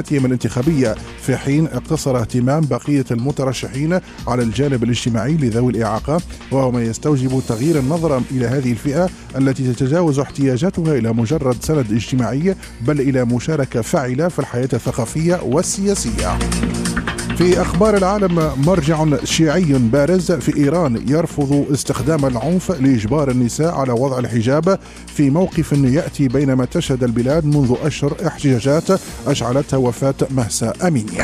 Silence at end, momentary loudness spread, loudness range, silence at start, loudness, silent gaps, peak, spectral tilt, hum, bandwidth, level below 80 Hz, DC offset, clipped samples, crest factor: 0 s; 5 LU; 3 LU; 0 s; -17 LUFS; none; -2 dBFS; -6 dB/octave; none; 14.5 kHz; -34 dBFS; under 0.1%; under 0.1%; 14 dB